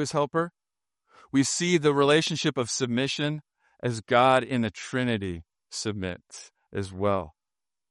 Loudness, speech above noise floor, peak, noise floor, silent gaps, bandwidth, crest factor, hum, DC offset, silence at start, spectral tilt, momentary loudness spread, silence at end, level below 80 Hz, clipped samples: -26 LUFS; over 64 dB; -6 dBFS; under -90 dBFS; none; 11.5 kHz; 20 dB; none; under 0.1%; 0 s; -4.5 dB/octave; 16 LU; 0.6 s; -64 dBFS; under 0.1%